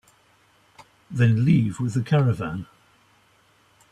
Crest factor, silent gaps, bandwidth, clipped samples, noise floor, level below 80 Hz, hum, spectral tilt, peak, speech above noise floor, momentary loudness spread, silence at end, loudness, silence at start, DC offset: 18 dB; none; 9.8 kHz; under 0.1%; -60 dBFS; -56 dBFS; none; -8 dB/octave; -8 dBFS; 39 dB; 15 LU; 1.3 s; -22 LUFS; 1.1 s; under 0.1%